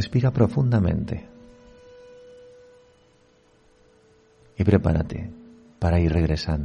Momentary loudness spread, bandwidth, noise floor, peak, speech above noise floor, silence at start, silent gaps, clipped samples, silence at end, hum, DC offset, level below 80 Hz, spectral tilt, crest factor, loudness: 13 LU; 9.4 kHz; -59 dBFS; -4 dBFS; 37 dB; 0 s; none; under 0.1%; 0 s; none; under 0.1%; -36 dBFS; -8.5 dB/octave; 20 dB; -23 LUFS